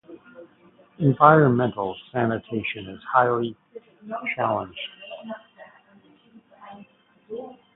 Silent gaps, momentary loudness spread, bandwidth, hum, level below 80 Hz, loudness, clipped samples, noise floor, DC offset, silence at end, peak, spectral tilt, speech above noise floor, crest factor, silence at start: none; 23 LU; 4 kHz; none; -62 dBFS; -22 LUFS; under 0.1%; -56 dBFS; under 0.1%; 0.25 s; 0 dBFS; -11.5 dB/octave; 34 dB; 24 dB; 0.1 s